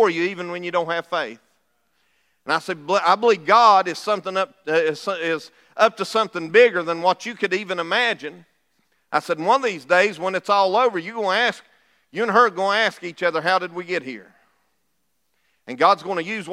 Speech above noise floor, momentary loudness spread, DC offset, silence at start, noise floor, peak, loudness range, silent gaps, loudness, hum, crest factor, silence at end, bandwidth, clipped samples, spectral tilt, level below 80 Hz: 53 dB; 11 LU; under 0.1%; 0 s; -73 dBFS; -2 dBFS; 5 LU; none; -20 LUFS; none; 18 dB; 0 s; 13.5 kHz; under 0.1%; -4 dB/octave; -80 dBFS